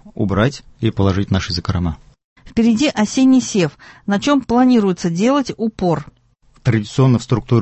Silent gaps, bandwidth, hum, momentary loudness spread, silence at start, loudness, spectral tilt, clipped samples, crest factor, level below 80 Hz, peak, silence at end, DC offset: 2.24-2.36 s; 8.4 kHz; none; 9 LU; 0.05 s; -17 LUFS; -6.5 dB/octave; under 0.1%; 16 dB; -36 dBFS; -2 dBFS; 0 s; under 0.1%